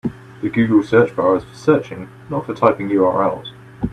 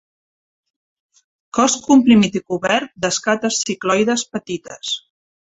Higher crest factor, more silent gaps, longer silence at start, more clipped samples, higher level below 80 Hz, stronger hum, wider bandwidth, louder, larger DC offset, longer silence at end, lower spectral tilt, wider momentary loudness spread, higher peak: about the same, 18 dB vs 18 dB; neither; second, 0.05 s vs 1.55 s; neither; first, -48 dBFS vs -58 dBFS; neither; first, 9.6 kHz vs 8.4 kHz; about the same, -17 LUFS vs -17 LUFS; neither; second, 0 s vs 0.6 s; first, -8 dB/octave vs -3.5 dB/octave; about the same, 15 LU vs 13 LU; about the same, 0 dBFS vs -2 dBFS